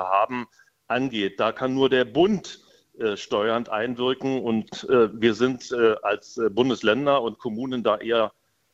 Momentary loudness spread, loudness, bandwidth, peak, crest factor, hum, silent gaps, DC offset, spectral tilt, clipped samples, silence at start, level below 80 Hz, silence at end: 8 LU; -24 LUFS; 8 kHz; -6 dBFS; 18 dB; none; none; under 0.1%; -5.5 dB/octave; under 0.1%; 0 s; -62 dBFS; 0.45 s